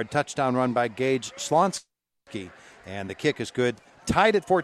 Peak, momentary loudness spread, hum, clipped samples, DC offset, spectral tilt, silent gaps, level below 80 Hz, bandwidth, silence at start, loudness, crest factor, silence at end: -6 dBFS; 17 LU; none; under 0.1%; under 0.1%; -4.5 dB/octave; none; -54 dBFS; 13.5 kHz; 0 s; -25 LUFS; 20 dB; 0 s